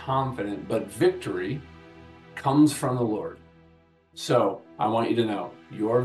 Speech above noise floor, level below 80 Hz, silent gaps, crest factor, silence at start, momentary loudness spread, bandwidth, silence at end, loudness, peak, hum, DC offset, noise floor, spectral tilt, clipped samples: 33 dB; -62 dBFS; none; 18 dB; 0 s; 15 LU; 12.5 kHz; 0 s; -26 LUFS; -8 dBFS; none; under 0.1%; -58 dBFS; -6 dB/octave; under 0.1%